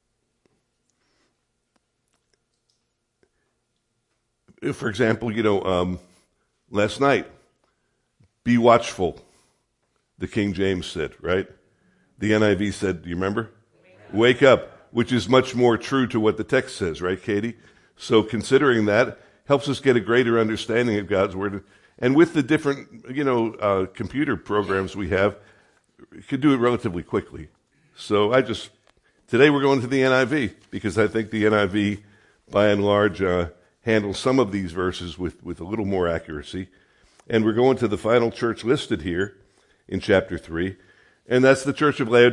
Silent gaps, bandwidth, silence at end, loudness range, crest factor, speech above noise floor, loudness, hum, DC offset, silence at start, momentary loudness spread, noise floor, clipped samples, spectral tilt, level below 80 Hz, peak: none; 11.5 kHz; 0 s; 5 LU; 20 dB; 53 dB; -22 LUFS; none; under 0.1%; 4.6 s; 13 LU; -74 dBFS; under 0.1%; -6 dB/octave; -54 dBFS; -2 dBFS